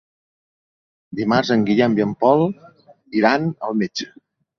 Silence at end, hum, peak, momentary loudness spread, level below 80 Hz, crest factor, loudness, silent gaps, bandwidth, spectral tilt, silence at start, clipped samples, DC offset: 0.55 s; none; -2 dBFS; 13 LU; -58 dBFS; 18 dB; -19 LUFS; none; 7.2 kHz; -6.5 dB/octave; 1.1 s; under 0.1%; under 0.1%